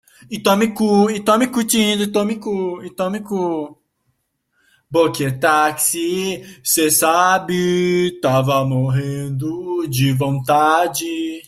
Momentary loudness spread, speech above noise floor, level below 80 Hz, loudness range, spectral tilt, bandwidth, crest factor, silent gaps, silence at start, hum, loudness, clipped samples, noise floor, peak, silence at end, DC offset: 10 LU; 51 dB; -56 dBFS; 5 LU; -4.5 dB/octave; 16 kHz; 16 dB; none; 0.3 s; none; -17 LUFS; under 0.1%; -69 dBFS; -2 dBFS; 0.05 s; under 0.1%